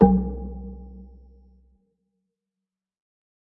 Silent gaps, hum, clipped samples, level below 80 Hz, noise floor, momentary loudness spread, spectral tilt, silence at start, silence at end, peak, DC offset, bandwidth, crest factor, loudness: none; none; under 0.1%; -38 dBFS; -88 dBFS; 25 LU; -13.5 dB/octave; 0 s; 2.35 s; -2 dBFS; under 0.1%; 1.9 kHz; 26 dB; -25 LUFS